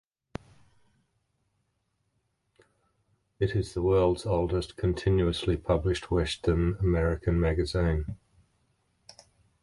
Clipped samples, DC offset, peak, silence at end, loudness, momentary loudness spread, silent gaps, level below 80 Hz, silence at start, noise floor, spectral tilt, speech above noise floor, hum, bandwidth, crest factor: under 0.1%; under 0.1%; -12 dBFS; 1.45 s; -28 LUFS; 12 LU; none; -38 dBFS; 3.4 s; -77 dBFS; -7 dB/octave; 50 dB; none; 11.5 kHz; 18 dB